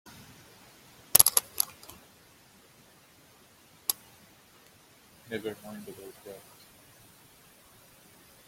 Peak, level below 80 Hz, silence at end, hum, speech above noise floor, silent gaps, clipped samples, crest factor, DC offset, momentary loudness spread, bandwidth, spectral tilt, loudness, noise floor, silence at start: 0 dBFS; -70 dBFS; 2.1 s; none; 18 dB; none; under 0.1%; 36 dB; under 0.1%; 30 LU; 16.5 kHz; -0.5 dB/octave; -26 LUFS; -59 dBFS; 1.15 s